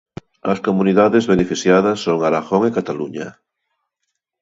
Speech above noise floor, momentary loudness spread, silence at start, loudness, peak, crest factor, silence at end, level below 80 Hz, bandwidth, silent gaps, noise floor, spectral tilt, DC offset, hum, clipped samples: 60 dB; 13 LU; 0.45 s; -17 LUFS; 0 dBFS; 18 dB; 1.1 s; -52 dBFS; 8 kHz; none; -76 dBFS; -6 dB/octave; under 0.1%; none; under 0.1%